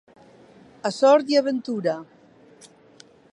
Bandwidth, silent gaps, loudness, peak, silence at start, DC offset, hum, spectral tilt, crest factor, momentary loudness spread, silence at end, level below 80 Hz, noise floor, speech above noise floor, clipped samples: 11 kHz; none; -22 LUFS; -6 dBFS; 0.85 s; under 0.1%; none; -5 dB/octave; 18 dB; 13 LU; 1.3 s; -76 dBFS; -52 dBFS; 32 dB; under 0.1%